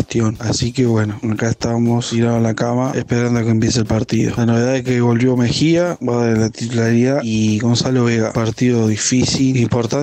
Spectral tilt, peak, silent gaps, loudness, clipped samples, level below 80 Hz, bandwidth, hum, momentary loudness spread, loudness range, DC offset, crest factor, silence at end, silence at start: -5.5 dB/octave; -4 dBFS; none; -16 LUFS; under 0.1%; -42 dBFS; 9 kHz; none; 4 LU; 1 LU; under 0.1%; 10 dB; 0 s; 0 s